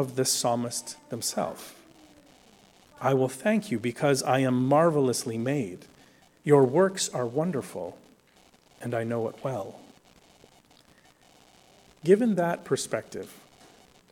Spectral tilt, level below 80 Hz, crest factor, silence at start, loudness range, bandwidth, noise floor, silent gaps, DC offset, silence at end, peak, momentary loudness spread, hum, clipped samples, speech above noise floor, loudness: -5 dB/octave; -70 dBFS; 20 dB; 0 s; 11 LU; 17.5 kHz; -60 dBFS; none; under 0.1%; 0.8 s; -8 dBFS; 16 LU; none; under 0.1%; 34 dB; -26 LUFS